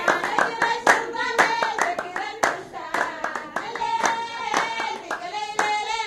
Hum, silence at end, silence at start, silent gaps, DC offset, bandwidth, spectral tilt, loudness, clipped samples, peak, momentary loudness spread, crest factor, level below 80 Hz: none; 0 s; 0 s; none; under 0.1%; 16 kHz; -1.5 dB/octave; -24 LUFS; under 0.1%; 0 dBFS; 10 LU; 24 dB; -62 dBFS